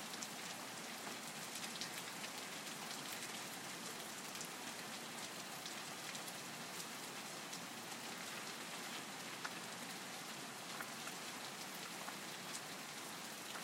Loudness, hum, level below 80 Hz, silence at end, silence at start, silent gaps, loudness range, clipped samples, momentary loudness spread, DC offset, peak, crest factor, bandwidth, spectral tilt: -47 LUFS; none; under -90 dBFS; 0 s; 0 s; none; 1 LU; under 0.1%; 2 LU; under 0.1%; -26 dBFS; 22 dB; 16 kHz; -1.5 dB/octave